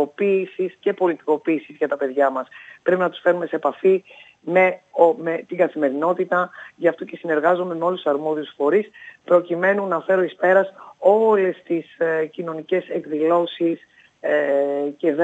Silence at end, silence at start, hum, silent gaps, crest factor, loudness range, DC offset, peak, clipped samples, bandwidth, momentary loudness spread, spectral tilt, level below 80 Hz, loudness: 0 s; 0 s; none; none; 18 dB; 3 LU; under 0.1%; -2 dBFS; under 0.1%; 7.8 kHz; 9 LU; -7.5 dB/octave; -84 dBFS; -21 LUFS